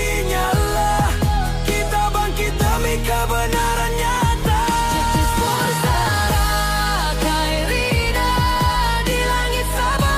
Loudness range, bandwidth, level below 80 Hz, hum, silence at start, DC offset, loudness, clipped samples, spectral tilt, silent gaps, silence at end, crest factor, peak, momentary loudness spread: 1 LU; 16 kHz; -22 dBFS; none; 0 s; under 0.1%; -19 LUFS; under 0.1%; -4 dB/octave; none; 0 s; 12 dB; -6 dBFS; 2 LU